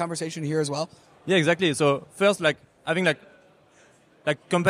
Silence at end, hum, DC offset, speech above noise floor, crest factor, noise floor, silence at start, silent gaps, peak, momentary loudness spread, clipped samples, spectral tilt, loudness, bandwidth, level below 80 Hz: 0 s; none; under 0.1%; 33 dB; 18 dB; -57 dBFS; 0 s; none; -6 dBFS; 11 LU; under 0.1%; -4.5 dB/octave; -25 LUFS; 15 kHz; -68 dBFS